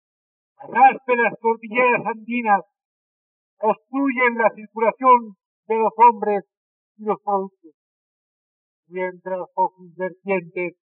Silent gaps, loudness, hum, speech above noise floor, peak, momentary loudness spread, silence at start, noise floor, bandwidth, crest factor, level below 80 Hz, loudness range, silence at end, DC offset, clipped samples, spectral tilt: 2.85-3.57 s, 5.46-5.63 s, 6.57-6.95 s, 7.74-8.83 s; -20 LUFS; none; over 70 dB; -2 dBFS; 14 LU; 0.6 s; under -90 dBFS; 3.8 kHz; 18 dB; under -90 dBFS; 9 LU; 0.25 s; under 0.1%; under 0.1%; -4 dB/octave